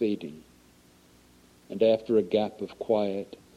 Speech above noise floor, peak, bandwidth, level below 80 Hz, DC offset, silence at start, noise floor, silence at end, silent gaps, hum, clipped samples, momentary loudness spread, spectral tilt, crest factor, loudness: 31 dB; -12 dBFS; 12.5 kHz; -66 dBFS; under 0.1%; 0 s; -58 dBFS; 0.2 s; none; none; under 0.1%; 13 LU; -7 dB/octave; 18 dB; -27 LUFS